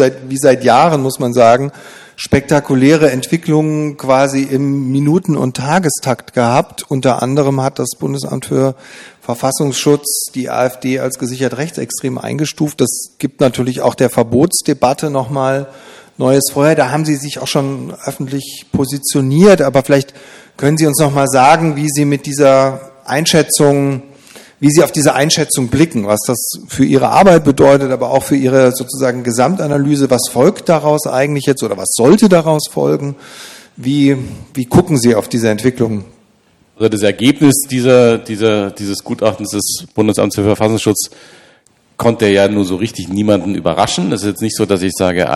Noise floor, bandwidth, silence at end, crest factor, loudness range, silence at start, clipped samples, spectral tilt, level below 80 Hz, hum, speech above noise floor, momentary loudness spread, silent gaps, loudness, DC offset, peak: -52 dBFS; 15 kHz; 0 s; 12 dB; 5 LU; 0 s; 0.4%; -5 dB/octave; -46 dBFS; none; 40 dB; 10 LU; none; -13 LUFS; under 0.1%; 0 dBFS